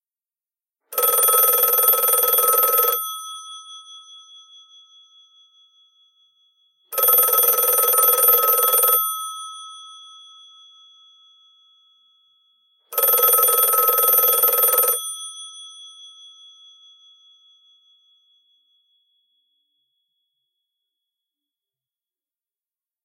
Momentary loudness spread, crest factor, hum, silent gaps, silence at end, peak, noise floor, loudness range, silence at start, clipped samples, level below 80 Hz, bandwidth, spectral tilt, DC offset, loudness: 22 LU; 18 dB; none; none; 6.95 s; -4 dBFS; under -90 dBFS; 12 LU; 0.9 s; under 0.1%; -82 dBFS; 17 kHz; 3.5 dB/octave; under 0.1%; -15 LUFS